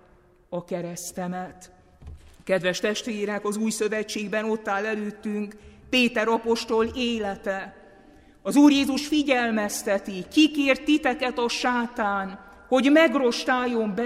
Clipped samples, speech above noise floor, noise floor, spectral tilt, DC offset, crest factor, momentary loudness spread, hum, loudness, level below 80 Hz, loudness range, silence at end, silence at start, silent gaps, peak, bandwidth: under 0.1%; 33 dB; -57 dBFS; -4 dB/octave; under 0.1%; 20 dB; 14 LU; none; -24 LUFS; -54 dBFS; 6 LU; 0 s; 0.5 s; none; -6 dBFS; 15.5 kHz